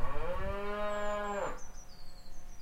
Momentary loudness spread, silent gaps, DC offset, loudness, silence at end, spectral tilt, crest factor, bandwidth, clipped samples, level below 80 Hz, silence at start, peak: 18 LU; none; under 0.1%; -38 LUFS; 0 s; -5 dB/octave; 16 dB; 8.2 kHz; under 0.1%; -42 dBFS; 0 s; -18 dBFS